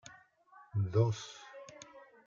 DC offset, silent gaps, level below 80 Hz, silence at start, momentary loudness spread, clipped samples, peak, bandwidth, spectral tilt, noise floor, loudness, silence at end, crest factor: under 0.1%; none; -72 dBFS; 0.1 s; 22 LU; under 0.1%; -16 dBFS; 7.4 kHz; -6.5 dB/octave; -62 dBFS; -34 LUFS; 0.3 s; 20 dB